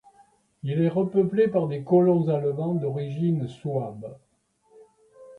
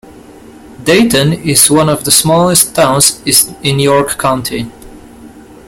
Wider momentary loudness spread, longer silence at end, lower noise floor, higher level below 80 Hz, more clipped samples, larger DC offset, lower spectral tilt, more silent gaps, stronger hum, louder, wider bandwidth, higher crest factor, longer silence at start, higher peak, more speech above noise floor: first, 12 LU vs 9 LU; second, 0 s vs 0.25 s; first, -63 dBFS vs -35 dBFS; second, -66 dBFS vs -40 dBFS; second, under 0.1% vs 0.4%; neither; first, -10 dB/octave vs -3.5 dB/octave; neither; neither; second, -24 LUFS vs -9 LUFS; second, 4.5 kHz vs over 20 kHz; about the same, 16 dB vs 12 dB; first, 0.65 s vs 0.05 s; second, -10 dBFS vs 0 dBFS; first, 39 dB vs 25 dB